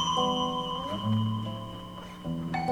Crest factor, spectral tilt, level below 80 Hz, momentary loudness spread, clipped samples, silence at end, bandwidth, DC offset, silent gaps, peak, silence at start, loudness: 16 dB; -5.5 dB/octave; -54 dBFS; 13 LU; under 0.1%; 0 s; 15 kHz; under 0.1%; none; -14 dBFS; 0 s; -31 LUFS